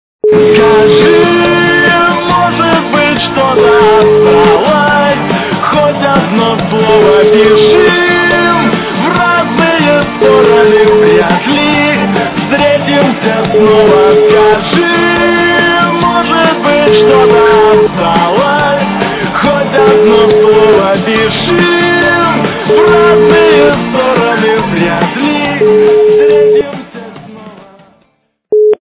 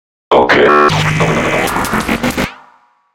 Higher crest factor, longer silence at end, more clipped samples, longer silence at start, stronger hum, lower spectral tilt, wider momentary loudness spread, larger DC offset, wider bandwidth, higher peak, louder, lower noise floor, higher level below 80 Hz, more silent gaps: about the same, 8 dB vs 12 dB; second, 0.1 s vs 0.6 s; first, 0.5% vs 0.2%; about the same, 0.25 s vs 0.3 s; neither; first, -9.5 dB/octave vs -5 dB/octave; about the same, 6 LU vs 8 LU; neither; second, 4 kHz vs 17 kHz; about the same, 0 dBFS vs 0 dBFS; first, -7 LUFS vs -12 LUFS; first, -56 dBFS vs -48 dBFS; about the same, -36 dBFS vs -34 dBFS; neither